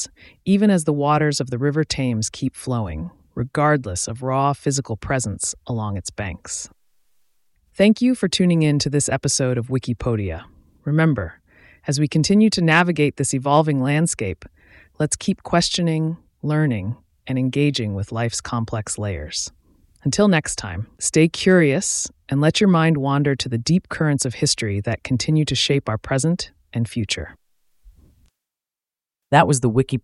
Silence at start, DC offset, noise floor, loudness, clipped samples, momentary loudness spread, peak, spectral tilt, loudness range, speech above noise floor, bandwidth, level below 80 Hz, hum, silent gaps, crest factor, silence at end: 0 s; under 0.1%; under -90 dBFS; -20 LUFS; under 0.1%; 12 LU; 0 dBFS; -5 dB/octave; 6 LU; over 70 dB; 12 kHz; -46 dBFS; none; none; 20 dB; 0.05 s